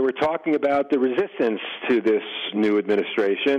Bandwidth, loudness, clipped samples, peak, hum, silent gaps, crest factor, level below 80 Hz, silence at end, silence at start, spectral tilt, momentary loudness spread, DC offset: 7.4 kHz; -22 LUFS; under 0.1%; -8 dBFS; none; none; 14 dB; -64 dBFS; 0 s; 0 s; -6.5 dB/octave; 4 LU; under 0.1%